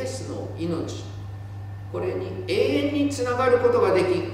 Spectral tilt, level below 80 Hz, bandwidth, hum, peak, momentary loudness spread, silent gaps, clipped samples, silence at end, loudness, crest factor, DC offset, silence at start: -6 dB/octave; -52 dBFS; 13.5 kHz; none; -8 dBFS; 17 LU; none; under 0.1%; 0 s; -24 LUFS; 16 dB; under 0.1%; 0 s